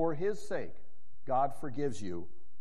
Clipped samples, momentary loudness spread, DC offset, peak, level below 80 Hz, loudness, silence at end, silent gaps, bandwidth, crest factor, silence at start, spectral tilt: under 0.1%; 16 LU; 3%; -18 dBFS; -64 dBFS; -36 LUFS; 0.3 s; none; 13 kHz; 16 dB; 0 s; -6.5 dB/octave